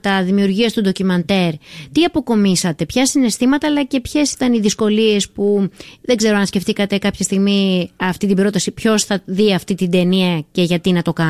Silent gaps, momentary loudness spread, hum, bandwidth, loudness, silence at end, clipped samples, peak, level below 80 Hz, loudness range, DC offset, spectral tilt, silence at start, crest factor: none; 4 LU; none; 15 kHz; -16 LUFS; 0 s; under 0.1%; -4 dBFS; -46 dBFS; 1 LU; under 0.1%; -5 dB/octave; 0.05 s; 12 dB